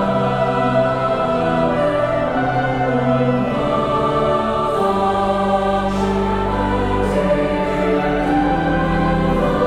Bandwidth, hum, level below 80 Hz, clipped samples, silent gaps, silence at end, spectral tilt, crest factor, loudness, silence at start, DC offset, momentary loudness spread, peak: 12.5 kHz; none; -32 dBFS; under 0.1%; none; 0 s; -7.5 dB/octave; 12 dB; -18 LUFS; 0 s; 0.3%; 2 LU; -4 dBFS